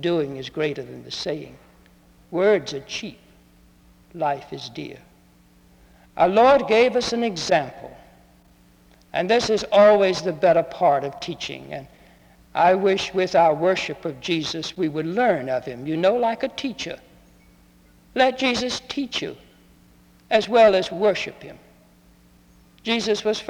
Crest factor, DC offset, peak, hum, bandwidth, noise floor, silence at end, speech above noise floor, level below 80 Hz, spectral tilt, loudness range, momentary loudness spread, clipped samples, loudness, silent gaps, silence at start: 18 dB; under 0.1%; -4 dBFS; none; 12.5 kHz; -54 dBFS; 0 s; 33 dB; -56 dBFS; -4.5 dB/octave; 7 LU; 18 LU; under 0.1%; -21 LUFS; none; 0 s